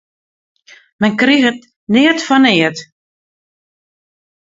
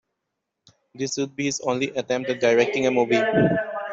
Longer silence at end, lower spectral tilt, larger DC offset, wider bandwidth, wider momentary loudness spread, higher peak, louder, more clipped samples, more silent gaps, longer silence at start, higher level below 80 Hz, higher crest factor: first, 1.55 s vs 0 s; about the same, -4.5 dB/octave vs -4.5 dB/octave; neither; about the same, 7.8 kHz vs 8 kHz; about the same, 8 LU vs 7 LU; first, 0 dBFS vs -6 dBFS; first, -12 LUFS vs -22 LUFS; neither; first, 1.76-1.87 s vs none; about the same, 1 s vs 0.95 s; about the same, -60 dBFS vs -64 dBFS; about the same, 16 dB vs 18 dB